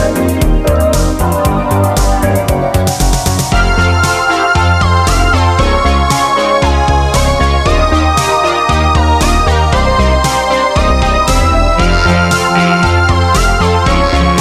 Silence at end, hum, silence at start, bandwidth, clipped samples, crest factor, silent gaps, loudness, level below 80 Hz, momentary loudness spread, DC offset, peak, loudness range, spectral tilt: 0 s; none; 0 s; 15.5 kHz; under 0.1%; 10 dB; none; -11 LUFS; -14 dBFS; 2 LU; under 0.1%; 0 dBFS; 2 LU; -5 dB/octave